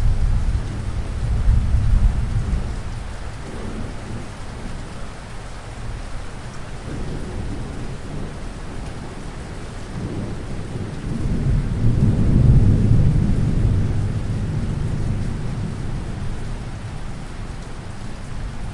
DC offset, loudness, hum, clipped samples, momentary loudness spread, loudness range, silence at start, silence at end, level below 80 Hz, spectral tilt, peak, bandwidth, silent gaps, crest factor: under 0.1%; -24 LUFS; none; under 0.1%; 16 LU; 14 LU; 0 s; 0 s; -24 dBFS; -7.5 dB/octave; -2 dBFS; 11 kHz; none; 18 dB